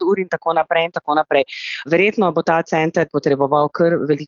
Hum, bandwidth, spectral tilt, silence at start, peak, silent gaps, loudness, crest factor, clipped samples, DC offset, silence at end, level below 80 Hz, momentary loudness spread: none; 7.2 kHz; -6.5 dB/octave; 0 s; -2 dBFS; none; -17 LUFS; 16 dB; under 0.1%; under 0.1%; 0 s; -62 dBFS; 3 LU